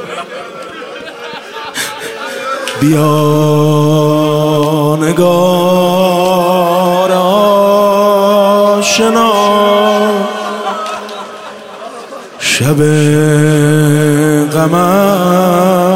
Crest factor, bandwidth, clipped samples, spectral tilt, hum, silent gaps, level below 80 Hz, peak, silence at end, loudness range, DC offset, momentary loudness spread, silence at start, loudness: 10 dB; 16 kHz; under 0.1%; -5.5 dB/octave; none; none; -50 dBFS; 0 dBFS; 0 s; 5 LU; under 0.1%; 16 LU; 0 s; -10 LUFS